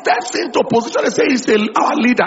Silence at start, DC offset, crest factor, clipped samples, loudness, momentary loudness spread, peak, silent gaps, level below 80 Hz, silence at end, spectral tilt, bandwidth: 0 s; under 0.1%; 14 dB; under 0.1%; -15 LUFS; 4 LU; -2 dBFS; none; -58 dBFS; 0 s; -4 dB/octave; 8 kHz